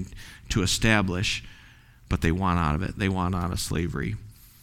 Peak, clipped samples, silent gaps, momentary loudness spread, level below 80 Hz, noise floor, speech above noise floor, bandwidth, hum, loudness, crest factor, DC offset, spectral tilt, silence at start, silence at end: -6 dBFS; under 0.1%; none; 11 LU; -38 dBFS; -52 dBFS; 26 dB; 16.5 kHz; none; -26 LUFS; 20 dB; under 0.1%; -4.5 dB/octave; 0 s; 0.3 s